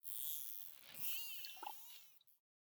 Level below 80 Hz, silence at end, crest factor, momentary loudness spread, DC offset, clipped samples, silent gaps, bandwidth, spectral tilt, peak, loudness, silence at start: under -90 dBFS; 0.3 s; 26 dB; 14 LU; under 0.1%; under 0.1%; none; over 20 kHz; 1.5 dB/octave; -22 dBFS; -44 LUFS; 0.05 s